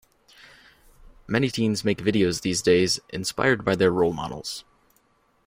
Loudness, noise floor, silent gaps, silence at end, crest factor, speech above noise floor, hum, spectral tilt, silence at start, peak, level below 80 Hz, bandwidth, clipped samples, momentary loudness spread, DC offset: -23 LUFS; -64 dBFS; none; 0.85 s; 20 dB; 41 dB; none; -4.5 dB/octave; 1.05 s; -6 dBFS; -54 dBFS; 16 kHz; under 0.1%; 11 LU; under 0.1%